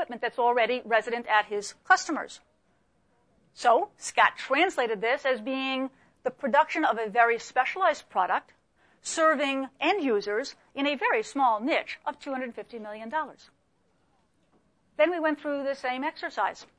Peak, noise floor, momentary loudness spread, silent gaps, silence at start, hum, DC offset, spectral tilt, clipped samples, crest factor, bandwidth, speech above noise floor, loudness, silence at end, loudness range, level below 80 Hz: -8 dBFS; -70 dBFS; 11 LU; none; 0 s; none; under 0.1%; -2.5 dB/octave; under 0.1%; 20 dB; 10.5 kHz; 43 dB; -27 LUFS; 0.15 s; 6 LU; -74 dBFS